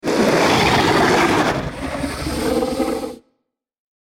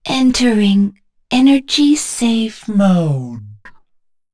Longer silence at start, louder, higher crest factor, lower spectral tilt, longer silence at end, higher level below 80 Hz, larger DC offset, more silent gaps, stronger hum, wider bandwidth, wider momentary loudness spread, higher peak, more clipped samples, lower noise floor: about the same, 0.05 s vs 0.05 s; second, -17 LUFS vs -14 LUFS; about the same, 12 dB vs 12 dB; about the same, -4.5 dB/octave vs -5 dB/octave; first, 1 s vs 0.6 s; first, -38 dBFS vs -46 dBFS; neither; neither; neither; first, 17 kHz vs 11 kHz; about the same, 11 LU vs 9 LU; second, -6 dBFS vs -2 dBFS; neither; first, -73 dBFS vs -58 dBFS